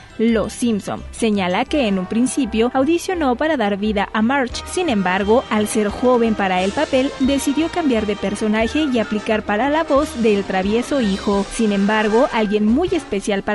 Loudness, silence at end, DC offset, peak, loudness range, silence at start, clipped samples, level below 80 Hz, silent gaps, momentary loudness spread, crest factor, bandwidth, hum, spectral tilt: -18 LUFS; 0 s; under 0.1%; -4 dBFS; 1 LU; 0 s; under 0.1%; -40 dBFS; none; 4 LU; 14 dB; 11.5 kHz; none; -5 dB/octave